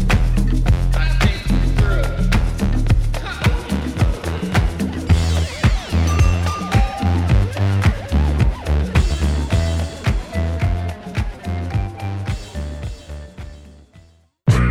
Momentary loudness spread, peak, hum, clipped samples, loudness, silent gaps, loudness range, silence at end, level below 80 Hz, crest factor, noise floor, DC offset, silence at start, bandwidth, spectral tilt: 9 LU; -2 dBFS; none; under 0.1%; -19 LUFS; none; 7 LU; 0 s; -20 dBFS; 16 dB; -49 dBFS; under 0.1%; 0 s; 13.5 kHz; -6.5 dB/octave